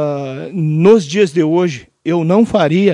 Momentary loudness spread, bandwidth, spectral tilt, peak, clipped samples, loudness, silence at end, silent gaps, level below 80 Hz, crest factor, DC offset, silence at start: 11 LU; 11 kHz; -7 dB/octave; 0 dBFS; under 0.1%; -14 LUFS; 0 s; none; -52 dBFS; 12 dB; under 0.1%; 0 s